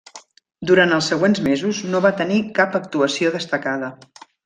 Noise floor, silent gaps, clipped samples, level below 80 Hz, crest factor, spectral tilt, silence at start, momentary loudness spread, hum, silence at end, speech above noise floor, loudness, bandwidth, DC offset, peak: -45 dBFS; none; under 0.1%; -60 dBFS; 18 dB; -5 dB/octave; 0.15 s; 9 LU; none; 0.5 s; 27 dB; -19 LUFS; 9.6 kHz; under 0.1%; -2 dBFS